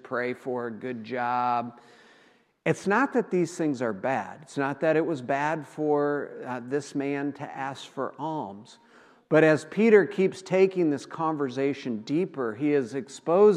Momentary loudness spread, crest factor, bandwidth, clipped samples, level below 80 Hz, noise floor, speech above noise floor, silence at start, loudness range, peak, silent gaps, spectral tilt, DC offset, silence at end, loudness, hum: 14 LU; 20 dB; 10.5 kHz; under 0.1%; -82 dBFS; -61 dBFS; 35 dB; 0.05 s; 6 LU; -6 dBFS; none; -6.5 dB/octave; under 0.1%; 0 s; -27 LUFS; none